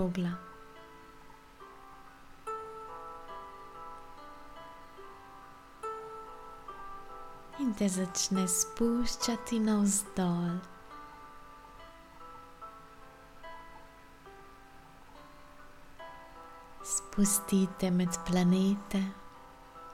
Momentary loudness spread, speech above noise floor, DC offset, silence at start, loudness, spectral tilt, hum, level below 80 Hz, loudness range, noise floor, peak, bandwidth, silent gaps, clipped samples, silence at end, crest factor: 25 LU; 23 dB; under 0.1%; 0 s; -32 LUFS; -4.5 dB/octave; none; -56 dBFS; 21 LU; -53 dBFS; -16 dBFS; 16.5 kHz; none; under 0.1%; 0 s; 20 dB